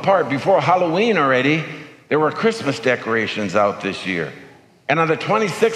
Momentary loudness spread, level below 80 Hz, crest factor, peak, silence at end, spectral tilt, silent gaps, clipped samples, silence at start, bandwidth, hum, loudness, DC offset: 9 LU; -66 dBFS; 16 dB; -4 dBFS; 0 s; -5.5 dB/octave; none; under 0.1%; 0 s; 13 kHz; none; -18 LUFS; under 0.1%